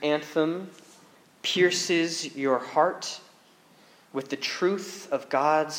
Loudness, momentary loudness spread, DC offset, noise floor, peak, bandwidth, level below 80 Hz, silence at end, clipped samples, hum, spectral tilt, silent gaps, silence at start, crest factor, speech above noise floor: -27 LUFS; 13 LU; under 0.1%; -57 dBFS; -8 dBFS; 16.5 kHz; -88 dBFS; 0 s; under 0.1%; none; -3.5 dB/octave; none; 0 s; 20 dB; 31 dB